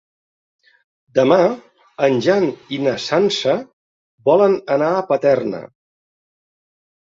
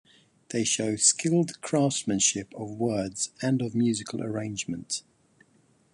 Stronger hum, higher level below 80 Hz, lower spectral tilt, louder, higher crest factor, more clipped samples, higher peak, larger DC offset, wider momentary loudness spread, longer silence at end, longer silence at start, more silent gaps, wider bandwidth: neither; about the same, -62 dBFS vs -64 dBFS; first, -5.5 dB/octave vs -3.5 dB/octave; first, -17 LUFS vs -27 LUFS; about the same, 18 dB vs 20 dB; neither; first, -2 dBFS vs -8 dBFS; neither; second, 8 LU vs 12 LU; first, 1.45 s vs 0.95 s; first, 1.15 s vs 0.5 s; first, 3.73-4.18 s vs none; second, 7.8 kHz vs 11.5 kHz